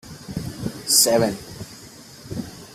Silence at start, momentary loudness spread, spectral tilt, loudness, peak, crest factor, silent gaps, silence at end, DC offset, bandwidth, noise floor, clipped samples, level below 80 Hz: 0.05 s; 25 LU; -2.5 dB/octave; -19 LUFS; -2 dBFS; 22 dB; none; 0 s; under 0.1%; 16 kHz; -43 dBFS; under 0.1%; -50 dBFS